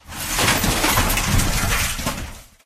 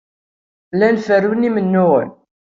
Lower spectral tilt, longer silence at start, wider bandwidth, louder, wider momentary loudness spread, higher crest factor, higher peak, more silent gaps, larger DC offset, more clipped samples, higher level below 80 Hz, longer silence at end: second, -3 dB/octave vs -8.5 dB/octave; second, 0.05 s vs 0.75 s; first, 15 kHz vs 7.2 kHz; second, -19 LUFS vs -15 LUFS; about the same, 9 LU vs 7 LU; about the same, 18 dB vs 14 dB; about the same, -2 dBFS vs -2 dBFS; neither; neither; neither; first, -28 dBFS vs -60 dBFS; second, 0.25 s vs 0.4 s